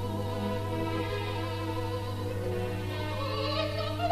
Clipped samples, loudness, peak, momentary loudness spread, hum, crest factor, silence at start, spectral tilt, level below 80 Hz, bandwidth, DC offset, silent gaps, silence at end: under 0.1%; -33 LUFS; -16 dBFS; 3 LU; none; 16 dB; 0 s; -6.5 dB/octave; -48 dBFS; 14 kHz; under 0.1%; none; 0 s